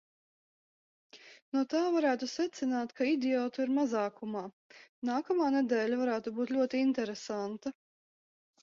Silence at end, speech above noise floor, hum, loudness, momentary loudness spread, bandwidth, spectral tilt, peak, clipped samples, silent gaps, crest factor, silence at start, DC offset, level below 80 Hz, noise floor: 0.9 s; over 58 dB; none; -32 LUFS; 10 LU; 7.6 kHz; -4.5 dB/octave; -18 dBFS; under 0.1%; 1.42-1.52 s, 4.53-4.70 s, 4.89-5.02 s; 16 dB; 1.15 s; under 0.1%; -80 dBFS; under -90 dBFS